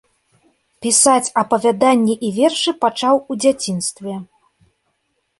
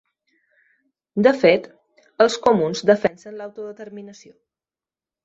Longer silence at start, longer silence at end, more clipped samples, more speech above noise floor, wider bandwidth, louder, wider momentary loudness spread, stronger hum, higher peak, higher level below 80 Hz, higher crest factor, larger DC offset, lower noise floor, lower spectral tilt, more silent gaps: second, 0.8 s vs 1.15 s; about the same, 1.15 s vs 1.1 s; neither; second, 53 dB vs over 71 dB; first, 12 kHz vs 8 kHz; about the same, -16 LUFS vs -18 LUFS; second, 12 LU vs 20 LU; neither; about the same, 0 dBFS vs -2 dBFS; about the same, -62 dBFS vs -64 dBFS; about the same, 18 dB vs 20 dB; neither; second, -69 dBFS vs under -90 dBFS; second, -3 dB/octave vs -5 dB/octave; neither